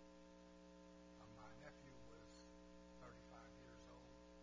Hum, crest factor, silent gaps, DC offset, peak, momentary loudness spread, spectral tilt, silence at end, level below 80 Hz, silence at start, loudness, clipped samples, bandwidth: 60 Hz at -70 dBFS; 16 dB; none; under 0.1%; -46 dBFS; 3 LU; -5 dB/octave; 0 s; -72 dBFS; 0 s; -63 LUFS; under 0.1%; 8 kHz